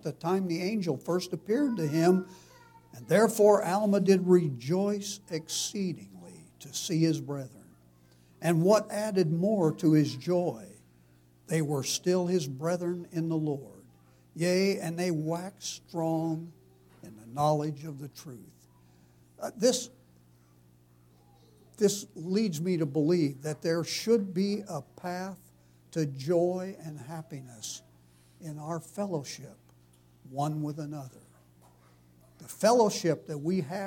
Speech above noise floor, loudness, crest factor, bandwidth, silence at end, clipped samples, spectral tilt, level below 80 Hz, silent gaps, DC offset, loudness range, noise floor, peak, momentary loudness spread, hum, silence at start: 32 dB; -29 LUFS; 20 dB; 17.5 kHz; 0 s; under 0.1%; -5.5 dB/octave; -72 dBFS; none; under 0.1%; 11 LU; -61 dBFS; -10 dBFS; 18 LU; 60 Hz at -60 dBFS; 0.05 s